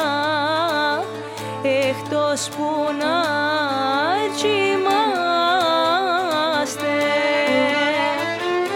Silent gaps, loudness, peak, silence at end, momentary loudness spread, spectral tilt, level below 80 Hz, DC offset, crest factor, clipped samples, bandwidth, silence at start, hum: none; -20 LUFS; -6 dBFS; 0 s; 5 LU; -3.5 dB/octave; -70 dBFS; under 0.1%; 14 dB; under 0.1%; 17.5 kHz; 0 s; none